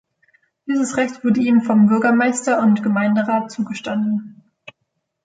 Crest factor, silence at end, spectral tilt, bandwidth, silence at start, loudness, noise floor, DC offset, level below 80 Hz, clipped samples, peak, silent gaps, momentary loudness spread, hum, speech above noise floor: 12 dB; 0.9 s; -6 dB/octave; 9.4 kHz; 0.65 s; -18 LUFS; -74 dBFS; under 0.1%; -64 dBFS; under 0.1%; -6 dBFS; none; 10 LU; none; 57 dB